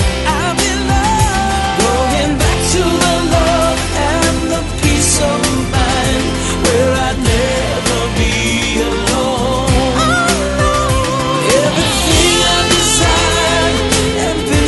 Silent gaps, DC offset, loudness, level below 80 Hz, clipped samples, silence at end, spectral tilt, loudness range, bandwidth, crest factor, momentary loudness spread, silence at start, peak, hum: none; under 0.1%; -13 LUFS; -22 dBFS; under 0.1%; 0 s; -3.5 dB/octave; 3 LU; 12 kHz; 12 dB; 5 LU; 0 s; 0 dBFS; none